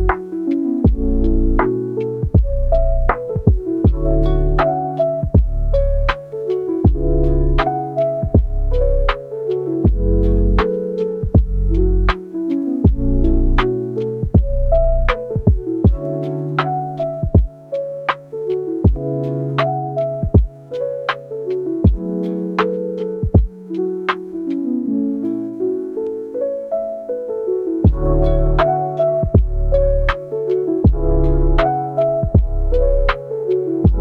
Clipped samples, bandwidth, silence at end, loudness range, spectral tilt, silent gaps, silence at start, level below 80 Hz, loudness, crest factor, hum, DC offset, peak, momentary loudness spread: under 0.1%; 5 kHz; 0 s; 3 LU; -9.5 dB/octave; none; 0 s; -20 dBFS; -19 LUFS; 16 dB; none; under 0.1%; 0 dBFS; 6 LU